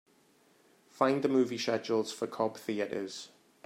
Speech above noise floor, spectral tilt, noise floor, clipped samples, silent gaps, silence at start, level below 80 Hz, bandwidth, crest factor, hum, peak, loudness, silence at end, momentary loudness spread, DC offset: 35 dB; -5 dB/octave; -66 dBFS; under 0.1%; none; 0.95 s; -82 dBFS; 16 kHz; 20 dB; none; -12 dBFS; -32 LUFS; 0.4 s; 12 LU; under 0.1%